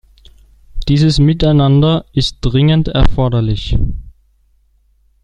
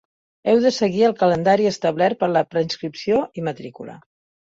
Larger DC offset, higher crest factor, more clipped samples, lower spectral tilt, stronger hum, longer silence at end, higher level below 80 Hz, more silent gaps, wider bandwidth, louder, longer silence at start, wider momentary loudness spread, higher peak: neither; about the same, 12 dB vs 16 dB; neither; first, -7.5 dB/octave vs -5.5 dB/octave; neither; first, 1.15 s vs 0.45 s; first, -22 dBFS vs -58 dBFS; neither; first, 9.8 kHz vs 7.8 kHz; first, -13 LUFS vs -20 LUFS; first, 0.75 s vs 0.45 s; second, 8 LU vs 13 LU; first, 0 dBFS vs -4 dBFS